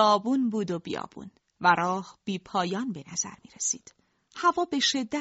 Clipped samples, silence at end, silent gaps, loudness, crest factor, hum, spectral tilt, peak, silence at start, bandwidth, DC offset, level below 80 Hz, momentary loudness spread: under 0.1%; 0 s; none; -28 LUFS; 20 dB; none; -3 dB/octave; -8 dBFS; 0 s; 8 kHz; under 0.1%; -68 dBFS; 12 LU